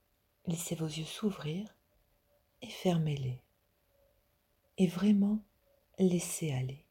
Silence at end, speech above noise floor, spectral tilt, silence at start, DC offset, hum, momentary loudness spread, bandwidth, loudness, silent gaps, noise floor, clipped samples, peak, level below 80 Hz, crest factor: 0.1 s; 42 dB; -6 dB/octave; 0.45 s; under 0.1%; none; 17 LU; 17 kHz; -34 LUFS; none; -74 dBFS; under 0.1%; -18 dBFS; -68 dBFS; 18 dB